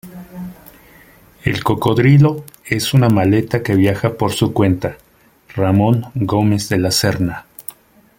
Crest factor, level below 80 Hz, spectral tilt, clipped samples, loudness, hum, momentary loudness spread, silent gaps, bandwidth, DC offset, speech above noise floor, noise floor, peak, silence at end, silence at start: 16 dB; -44 dBFS; -6 dB/octave; under 0.1%; -16 LUFS; none; 19 LU; none; 17 kHz; under 0.1%; 33 dB; -47 dBFS; 0 dBFS; 0.5 s; 0.05 s